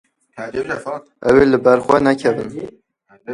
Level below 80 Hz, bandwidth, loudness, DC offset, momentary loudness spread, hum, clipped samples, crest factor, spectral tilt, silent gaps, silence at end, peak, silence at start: -46 dBFS; 11 kHz; -16 LUFS; under 0.1%; 18 LU; none; under 0.1%; 18 dB; -6.5 dB/octave; none; 0 s; 0 dBFS; 0.35 s